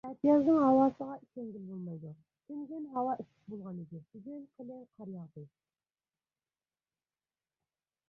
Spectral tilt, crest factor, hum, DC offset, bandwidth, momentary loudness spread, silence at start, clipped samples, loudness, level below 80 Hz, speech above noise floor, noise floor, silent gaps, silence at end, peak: -10 dB/octave; 20 dB; none; under 0.1%; 5.8 kHz; 23 LU; 0.05 s; under 0.1%; -31 LUFS; -76 dBFS; over 57 dB; under -90 dBFS; none; 2.65 s; -14 dBFS